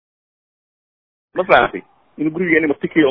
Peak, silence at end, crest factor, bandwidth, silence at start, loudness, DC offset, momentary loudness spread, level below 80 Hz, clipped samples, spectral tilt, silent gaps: 0 dBFS; 0 s; 18 dB; 5.4 kHz; 1.35 s; -16 LUFS; under 0.1%; 12 LU; -52 dBFS; under 0.1%; -8.5 dB/octave; none